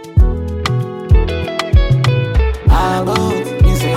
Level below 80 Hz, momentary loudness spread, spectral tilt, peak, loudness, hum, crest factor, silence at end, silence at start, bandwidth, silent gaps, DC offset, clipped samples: -16 dBFS; 5 LU; -6.5 dB/octave; 0 dBFS; -15 LUFS; none; 12 dB; 0 s; 0 s; 15.5 kHz; none; under 0.1%; under 0.1%